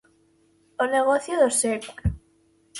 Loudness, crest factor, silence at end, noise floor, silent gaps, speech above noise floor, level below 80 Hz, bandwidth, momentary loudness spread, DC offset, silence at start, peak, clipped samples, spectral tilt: -23 LUFS; 18 dB; 0 s; -62 dBFS; none; 40 dB; -42 dBFS; 12 kHz; 13 LU; under 0.1%; 0.8 s; -8 dBFS; under 0.1%; -4 dB/octave